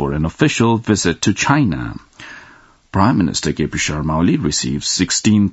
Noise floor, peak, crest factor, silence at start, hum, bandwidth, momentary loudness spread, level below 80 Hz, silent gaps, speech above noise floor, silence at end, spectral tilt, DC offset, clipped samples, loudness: -46 dBFS; 0 dBFS; 16 dB; 0 s; none; 8.2 kHz; 12 LU; -38 dBFS; none; 30 dB; 0 s; -4.5 dB/octave; under 0.1%; under 0.1%; -16 LUFS